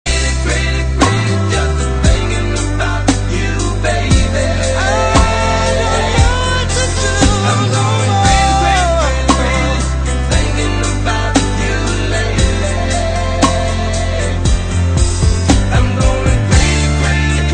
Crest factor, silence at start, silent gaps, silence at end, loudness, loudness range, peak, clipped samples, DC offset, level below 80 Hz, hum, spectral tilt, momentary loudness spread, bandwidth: 12 dB; 0.05 s; none; 0 s; -14 LUFS; 3 LU; 0 dBFS; under 0.1%; under 0.1%; -16 dBFS; none; -4.5 dB/octave; 5 LU; 10 kHz